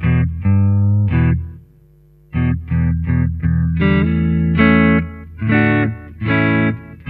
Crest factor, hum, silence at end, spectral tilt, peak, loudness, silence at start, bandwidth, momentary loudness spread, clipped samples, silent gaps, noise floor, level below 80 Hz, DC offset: 16 dB; none; 0 s; -11 dB/octave; 0 dBFS; -16 LUFS; 0 s; 4.4 kHz; 9 LU; under 0.1%; none; -48 dBFS; -28 dBFS; under 0.1%